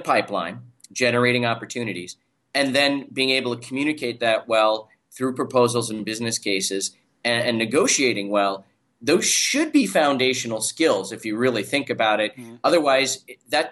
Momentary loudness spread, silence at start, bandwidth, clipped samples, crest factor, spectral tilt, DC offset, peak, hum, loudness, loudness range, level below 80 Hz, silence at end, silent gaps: 10 LU; 0 s; 12.5 kHz; under 0.1%; 16 dB; -3 dB/octave; under 0.1%; -6 dBFS; none; -21 LUFS; 3 LU; -70 dBFS; 0 s; none